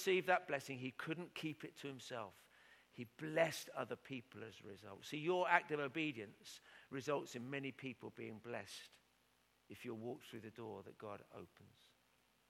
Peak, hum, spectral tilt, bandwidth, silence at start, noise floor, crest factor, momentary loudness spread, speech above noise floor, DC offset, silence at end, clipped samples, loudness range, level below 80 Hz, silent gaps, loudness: -16 dBFS; none; -4.5 dB/octave; 16.5 kHz; 0 s; -77 dBFS; 30 dB; 19 LU; 33 dB; under 0.1%; 0.8 s; under 0.1%; 11 LU; -88 dBFS; none; -44 LUFS